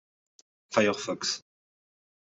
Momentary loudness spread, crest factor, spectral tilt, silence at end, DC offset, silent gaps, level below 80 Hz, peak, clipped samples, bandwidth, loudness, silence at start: 6 LU; 24 dB; -3 dB/octave; 0.95 s; under 0.1%; none; -74 dBFS; -10 dBFS; under 0.1%; 8.2 kHz; -29 LUFS; 0.7 s